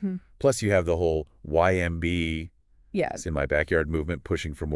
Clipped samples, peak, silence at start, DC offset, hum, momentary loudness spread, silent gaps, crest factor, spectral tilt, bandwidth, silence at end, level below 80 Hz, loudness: under 0.1%; -8 dBFS; 0 s; under 0.1%; none; 8 LU; none; 20 dB; -6 dB/octave; 12 kHz; 0 s; -42 dBFS; -26 LUFS